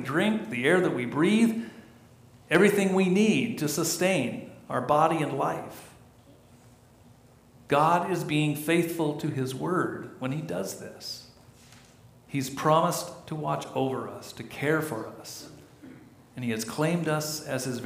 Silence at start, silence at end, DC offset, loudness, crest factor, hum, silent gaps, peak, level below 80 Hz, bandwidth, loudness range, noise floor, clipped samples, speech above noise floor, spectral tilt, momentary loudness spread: 0 s; 0 s; under 0.1%; -27 LUFS; 20 dB; none; none; -8 dBFS; -66 dBFS; 15.5 kHz; 8 LU; -55 dBFS; under 0.1%; 29 dB; -5 dB/octave; 16 LU